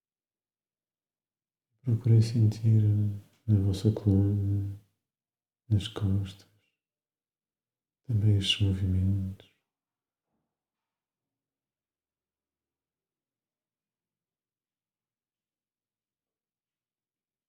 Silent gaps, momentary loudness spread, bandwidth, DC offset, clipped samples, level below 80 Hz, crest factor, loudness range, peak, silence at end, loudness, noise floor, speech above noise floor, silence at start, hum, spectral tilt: none; 12 LU; 10 kHz; under 0.1%; under 0.1%; -66 dBFS; 18 dB; 10 LU; -12 dBFS; 8.15 s; -27 LUFS; under -90 dBFS; over 64 dB; 1.85 s; none; -7 dB/octave